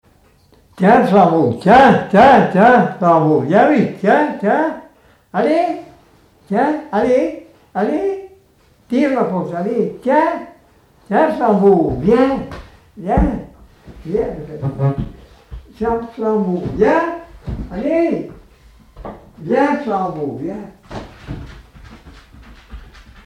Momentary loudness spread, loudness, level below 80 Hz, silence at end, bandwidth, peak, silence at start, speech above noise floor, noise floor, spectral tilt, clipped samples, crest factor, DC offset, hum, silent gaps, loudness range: 21 LU; -15 LUFS; -36 dBFS; 0.35 s; 11 kHz; -2 dBFS; 0.75 s; 38 dB; -52 dBFS; -8 dB/octave; under 0.1%; 14 dB; under 0.1%; none; none; 11 LU